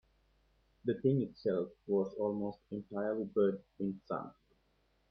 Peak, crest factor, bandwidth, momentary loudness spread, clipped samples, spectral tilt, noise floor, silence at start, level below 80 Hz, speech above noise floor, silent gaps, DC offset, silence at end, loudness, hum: -18 dBFS; 18 dB; 5.4 kHz; 10 LU; under 0.1%; -10.5 dB/octave; -74 dBFS; 0.85 s; -72 dBFS; 39 dB; none; under 0.1%; 0.8 s; -36 LUFS; none